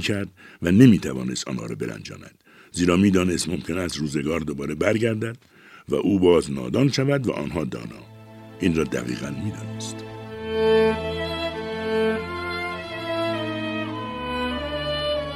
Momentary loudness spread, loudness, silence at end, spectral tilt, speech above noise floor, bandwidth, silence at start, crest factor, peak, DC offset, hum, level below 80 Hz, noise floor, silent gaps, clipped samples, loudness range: 14 LU; -23 LUFS; 0 s; -5.5 dB/octave; 21 dB; 15 kHz; 0 s; 22 dB; -2 dBFS; under 0.1%; none; -46 dBFS; -43 dBFS; none; under 0.1%; 5 LU